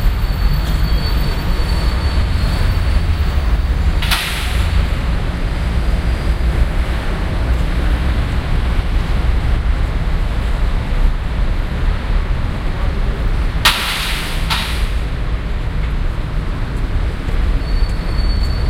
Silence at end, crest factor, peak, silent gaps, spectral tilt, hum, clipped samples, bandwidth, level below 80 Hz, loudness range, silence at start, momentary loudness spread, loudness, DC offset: 0 s; 16 dB; 0 dBFS; none; -5 dB/octave; none; under 0.1%; 16 kHz; -16 dBFS; 3 LU; 0 s; 4 LU; -19 LUFS; under 0.1%